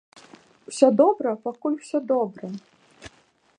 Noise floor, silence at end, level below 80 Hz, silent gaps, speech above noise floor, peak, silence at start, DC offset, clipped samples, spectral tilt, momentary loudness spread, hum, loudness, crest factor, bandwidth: -61 dBFS; 0.5 s; -68 dBFS; none; 38 dB; -2 dBFS; 0.7 s; under 0.1%; under 0.1%; -6 dB/octave; 19 LU; none; -22 LUFS; 22 dB; 10 kHz